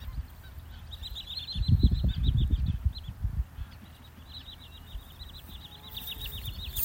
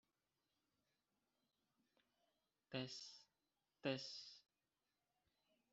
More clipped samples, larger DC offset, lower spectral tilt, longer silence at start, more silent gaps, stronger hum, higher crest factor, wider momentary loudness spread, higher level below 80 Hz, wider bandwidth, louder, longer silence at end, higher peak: neither; neither; first, -5.5 dB/octave vs -3.5 dB/octave; second, 0 s vs 2.7 s; neither; neither; second, 22 dB vs 28 dB; first, 19 LU vs 16 LU; first, -34 dBFS vs under -90 dBFS; first, 17 kHz vs 7.6 kHz; first, -32 LUFS vs -50 LUFS; second, 0 s vs 1.3 s; first, -10 dBFS vs -30 dBFS